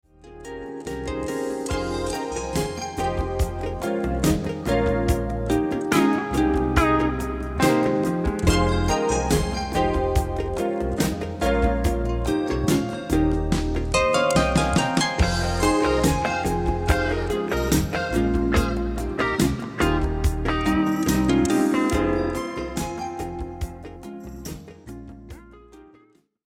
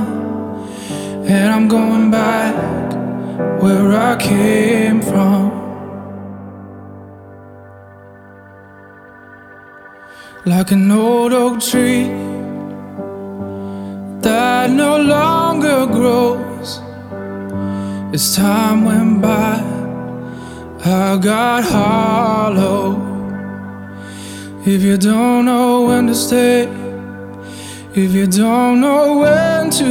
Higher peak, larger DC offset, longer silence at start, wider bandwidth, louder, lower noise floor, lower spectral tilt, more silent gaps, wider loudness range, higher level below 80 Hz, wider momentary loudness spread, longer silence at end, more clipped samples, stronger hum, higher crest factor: second, -4 dBFS vs 0 dBFS; neither; first, 0.25 s vs 0 s; about the same, 17.5 kHz vs 17.5 kHz; second, -23 LUFS vs -14 LUFS; first, -58 dBFS vs -39 dBFS; about the same, -5.5 dB/octave vs -5.5 dB/octave; neither; about the same, 6 LU vs 4 LU; first, -30 dBFS vs -48 dBFS; second, 12 LU vs 17 LU; first, 0.65 s vs 0 s; neither; neither; first, 20 dB vs 14 dB